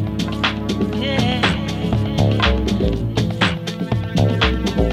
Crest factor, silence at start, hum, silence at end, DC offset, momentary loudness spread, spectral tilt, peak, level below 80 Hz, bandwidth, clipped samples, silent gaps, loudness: 14 dB; 0 s; none; 0 s; under 0.1%; 5 LU; -6 dB/octave; -4 dBFS; -28 dBFS; 13 kHz; under 0.1%; none; -19 LUFS